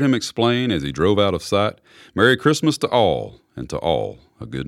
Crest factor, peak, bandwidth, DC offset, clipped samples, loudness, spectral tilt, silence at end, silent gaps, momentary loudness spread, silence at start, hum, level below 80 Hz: 18 dB; -2 dBFS; 15 kHz; under 0.1%; under 0.1%; -19 LUFS; -5 dB/octave; 0 s; none; 14 LU; 0 s; none; -46 dBFS